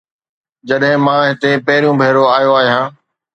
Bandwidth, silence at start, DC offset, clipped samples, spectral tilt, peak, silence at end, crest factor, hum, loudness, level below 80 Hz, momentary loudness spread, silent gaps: 8 kHz; 0.65 s; under 0.1%; under 0.1%; -6.5 dB/octave; 0 dBFS; 0.45 s; 14 dB; none; -12 LUFS; -62 dBFS; 6 LU; none